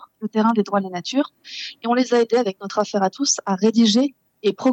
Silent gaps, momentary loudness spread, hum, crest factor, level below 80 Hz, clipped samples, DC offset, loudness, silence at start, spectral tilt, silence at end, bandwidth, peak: none; 9 LU; none; 16 dB; -84 dBFS; under 0.1%; under 0.1%; -20 LUFS; 0 s; -4 dB/octave; 0 s; 8.4 kHz; -4 dBFS